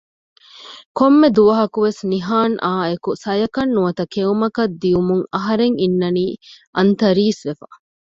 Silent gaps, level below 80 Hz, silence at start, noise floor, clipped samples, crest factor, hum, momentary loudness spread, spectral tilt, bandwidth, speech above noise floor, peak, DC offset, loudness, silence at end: 0.86-0.95 s, 6.67-6.73 s; -52 dBFS; 0.6 s; -40 dBFS; under 0.1%; 16 dB; none; 13 LU; -7 dB/octave; 7.8 kHz; 23 dB; -2 dBFS; under 0.1%; -17 LUFS; 0.45 s